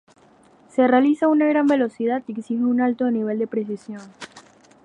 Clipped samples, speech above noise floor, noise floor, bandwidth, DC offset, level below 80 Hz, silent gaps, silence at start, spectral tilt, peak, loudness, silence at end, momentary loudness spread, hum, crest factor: under 0.1%; 33 dB; -53 dBFS; 9.6 kHz; under 0.1%; -74 dBFS; none; 0.75 s; -6.5 dB/octave; -4 dBFS; -21 LUFS; 0.45 s; 20 LU; none; 18 dB